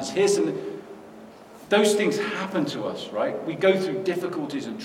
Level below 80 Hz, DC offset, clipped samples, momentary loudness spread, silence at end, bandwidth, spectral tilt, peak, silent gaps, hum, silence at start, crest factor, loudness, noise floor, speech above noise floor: -72 dBFS; under 0.1%; under 0.1%; 15 LU; 0 s; 16 kHz; -4.5 dB/octave; -8 dBFS; none; none; 0 s; 18 dB; -25 LUFS; -45 dBFS; 21 dB